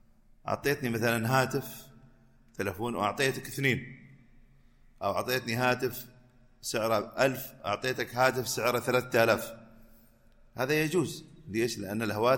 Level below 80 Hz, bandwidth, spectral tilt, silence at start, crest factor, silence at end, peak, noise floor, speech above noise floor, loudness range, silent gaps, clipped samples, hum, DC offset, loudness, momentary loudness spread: -60 dBFS; 17 kHz; -4.5 dB/octave; 0.45 s; 20 dB; 0 s; -10 dBFS; -59 dBFS; 30 dB; 4 LU; none; under 0.1%; none; under 0.1%; -30 LUFS; 15 LU